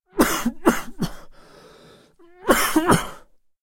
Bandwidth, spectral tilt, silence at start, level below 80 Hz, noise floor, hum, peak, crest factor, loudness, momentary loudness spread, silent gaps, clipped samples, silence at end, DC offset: 16.5 kHz; -4 dB/octave; 0.15 s; -40 dBFS; -50 dBFS; none; -2 dBFS; 22 dB; -21 LUFS; 13 LU; none; under 0.1%; 0.45 s; under 0.1%